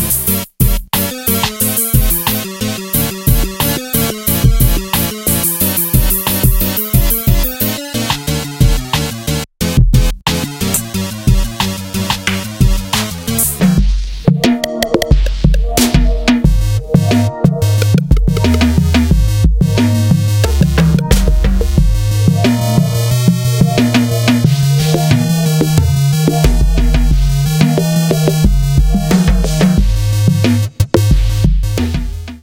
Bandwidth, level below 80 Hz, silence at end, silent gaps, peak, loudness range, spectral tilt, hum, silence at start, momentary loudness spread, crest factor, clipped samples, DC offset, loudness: 17.5 kHz; -16 dBFS; 0.05 s; none; 0 dBFS; 3 LU; -5 dB/octave; none; 0 s; 5 LU; 12 dB; 0.1%; under 0.1%; -13 LUFS